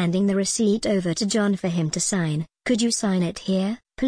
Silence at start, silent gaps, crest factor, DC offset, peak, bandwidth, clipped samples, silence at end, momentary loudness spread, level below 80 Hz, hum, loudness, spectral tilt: 0 s; none; 12 dB; under 0.1%; -10 dBFS; 10.5 kHz; under 0.1%; 0 s; 4 LU; -54 dBFS; none; -23 LUFS; -5 dB/octave